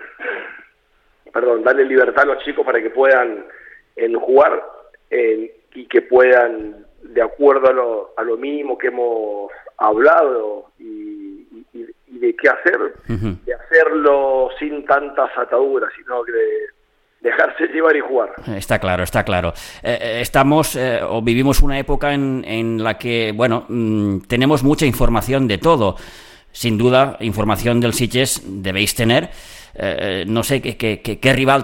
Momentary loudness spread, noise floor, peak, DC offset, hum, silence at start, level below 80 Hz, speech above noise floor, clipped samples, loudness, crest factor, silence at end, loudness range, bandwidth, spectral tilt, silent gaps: 14 LU; -58 dBFS; 0 dBFS; under 0.1%; none; 0 s; -30 dBFS; 42 dB; under 0.1%; -17 LUFS; 16 dB; 0 s; 3 LU; 17 kHz; -5 dB/octave; none